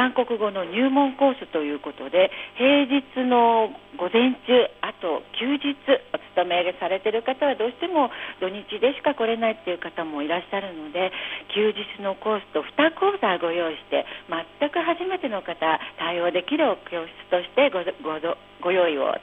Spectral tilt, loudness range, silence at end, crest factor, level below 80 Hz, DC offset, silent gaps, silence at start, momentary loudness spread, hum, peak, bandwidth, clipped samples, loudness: -7 dB/octave; 5 LU; 0 s; 16 dB; -66 dBFS; under 0.1%; none; 0 s; 10 LU; none; -6 dBFS; 4 kHz; under 0.1%; -24 LUFS